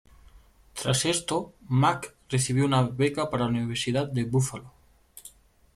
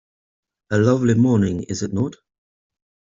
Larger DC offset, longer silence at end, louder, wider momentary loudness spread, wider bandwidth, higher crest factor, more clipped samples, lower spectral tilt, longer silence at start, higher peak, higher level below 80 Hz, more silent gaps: neither; second, 0.5 s vs 1.05 s; second, -26 LUFS vs -20 LUFS; first, 15 LU vs 9 LU; first, 14.5 kHz vs 7.8 kHz; about the same, 18 dB vs 18 dB; neither; second, -5 dB/octave vs -7 dB/octave; second, 0.35 s vs 0.7 s; second, -8 dBFS vs -4 dBFS; about the same, -56 dBFS vs -54 dBFS; neither